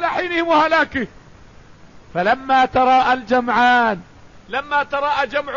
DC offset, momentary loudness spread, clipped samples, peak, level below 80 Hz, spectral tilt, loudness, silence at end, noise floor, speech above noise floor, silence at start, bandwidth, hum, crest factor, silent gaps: 0.3%; 12 LU; under 0.1%; -4 dBFS; -48 dBFS; -5 dB/octave; -17 LUFS; 0 s; -44 dBFS; 27 dB; 0 s; 7.4 kHz; none; 14 dB; none